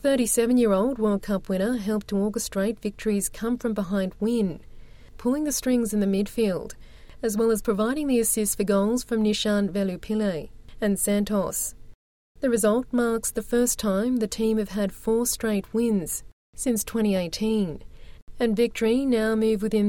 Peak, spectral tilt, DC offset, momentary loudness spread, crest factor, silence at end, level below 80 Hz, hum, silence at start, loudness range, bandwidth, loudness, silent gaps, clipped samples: -10 dBFS; -4.5 dB/octave; under 0.1%; 7 LU; 14 dB; 0 s; -46 dBFS; none; 0 s; 3 LU; 17 kHz; -25 LUFS; 11.95-12.35 s, 16.33-16.53 s, 18.22-18.27 s; under 0.1%